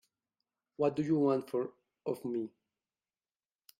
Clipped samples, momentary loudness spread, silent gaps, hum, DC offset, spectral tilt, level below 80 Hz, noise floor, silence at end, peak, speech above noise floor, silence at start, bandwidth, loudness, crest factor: under 0.1%; 13 LU; none; none; under 0.1%; -8.5 dB/octave; -78 dBFS; under -90 dBFS; 1.3 s; -18 dBFS; over 58 dB; 0.8 s; 16 kHz; -34 LUFS; 20 dB